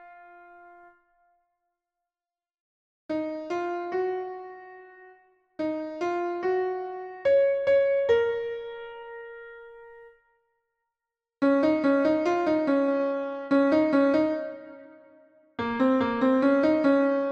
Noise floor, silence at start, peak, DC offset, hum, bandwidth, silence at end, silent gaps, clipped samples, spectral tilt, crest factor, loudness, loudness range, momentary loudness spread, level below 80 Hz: under -90 dBFS; 0 s; -10 dBFS; under 0.1%; none; 7 kHz; 0 s; 2.60-3.09 s; under 0.1%; -6.5 dB/octave; 16 dB; -25 LUFS; 10 LU; 19 LU; -66 dBFS